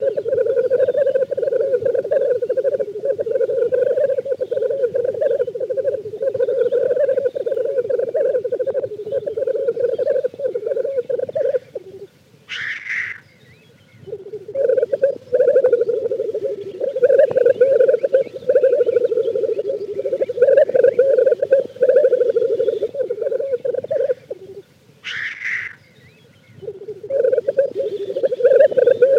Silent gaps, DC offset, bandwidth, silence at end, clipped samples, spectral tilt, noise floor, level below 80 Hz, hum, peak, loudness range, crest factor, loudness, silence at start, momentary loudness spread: none; under 0.1%; 6.6 kHz; 0 s; under 0.1%; -5.5 dB/octave; -49 dBFS; -72 dBFS; none; -4 dBFS; 8 LU; 16 dB; -18 LUFS; 0 s; 11 LU